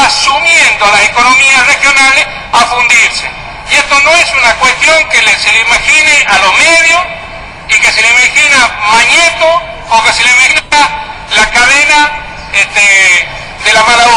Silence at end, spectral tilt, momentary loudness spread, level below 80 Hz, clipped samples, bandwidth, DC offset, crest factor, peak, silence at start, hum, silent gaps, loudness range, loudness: 0 s; 0 dB/octave; 8 LU; -32 dBFS; 0.6%; 18.5 kHz; under 0.1%; 6 dB; 0 dBFS; 0 s; none; none; 2 LU; -5 LUFS